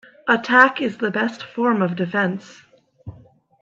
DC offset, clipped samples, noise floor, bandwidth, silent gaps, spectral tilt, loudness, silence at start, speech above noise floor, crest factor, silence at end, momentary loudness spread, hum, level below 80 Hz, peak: under 0.1%; under 0.1%; -50 dBFS; 7.6 kHz; none; -6 dB/octave; -19 LUFS; 0.25 s; 30 dB; 20 dB; 0.5 s; 10 LU; none; -62 dBFS; 0 dBFS